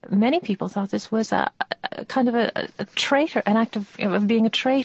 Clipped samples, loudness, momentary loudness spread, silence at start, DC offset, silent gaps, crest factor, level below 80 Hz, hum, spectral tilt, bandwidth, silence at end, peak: under 0.1%; -23 LUFS; 8 LU; 0.05 s; under 0.1%; none; 16 dB; -66 dBFS; none; -5.5 dB/octave; 8.4 kHz; 0 s; -6 dBFS